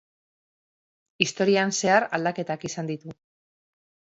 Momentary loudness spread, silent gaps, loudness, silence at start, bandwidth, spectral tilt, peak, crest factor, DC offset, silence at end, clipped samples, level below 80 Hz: 12 LU; none; -24 LUFS; 1.2 s; 8.2 kHz; -3.5 dB/octave; -2 dBFS; 24 dB; under 0.1%; 1.05 s; under 0.1%; -72 dBFS